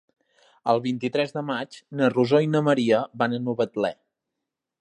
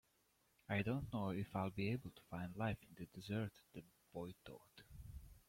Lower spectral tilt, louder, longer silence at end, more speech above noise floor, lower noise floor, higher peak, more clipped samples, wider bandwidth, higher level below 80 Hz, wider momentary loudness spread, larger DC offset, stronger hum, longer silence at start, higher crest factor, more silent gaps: about the same, -7 dB/octave vs -7.5 dB/octave; first, -24 LUFS vs -46 LUFS; first, 0.85 s vs 0.1 s; first, 61 dB vs 34 dB; first, -84 dBFS vs -79 dBFS; first, -6 dBFS vs -28 dBFS; neither; second, 10 kHz vs 16.5 kHz; second, -72 dBFS vs -66 dBFS; second, 9 LU vs 17 LU; neither; neither; about the same, 0.65 s vs 0.7 s; about the same, 18 dB vs 18 dB; neither